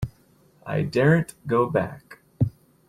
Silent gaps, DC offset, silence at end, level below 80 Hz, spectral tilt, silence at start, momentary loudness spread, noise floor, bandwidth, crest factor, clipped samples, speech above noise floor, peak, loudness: none; under 0.1%; 0.4 s; -50 dBFS; -8 dB/octave; 0 s; 16 LU; -58 dBFS; 14 kHz; 18 dB; under 0.1%; 36 dB; -8 dBFS; -24 LUFS